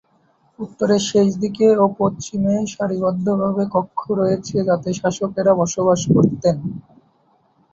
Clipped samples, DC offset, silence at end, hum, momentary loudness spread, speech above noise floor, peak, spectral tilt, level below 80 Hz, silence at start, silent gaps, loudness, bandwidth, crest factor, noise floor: under 0.1%; under 0.1%; 0.9 s; none; 8 LU; 42 dB; -2 dBFS; -6.5 dB/octave; -52 dBFS; 0.6 s; none; -18 LUFS; 8 kHz; 16 dB; -59 dBFS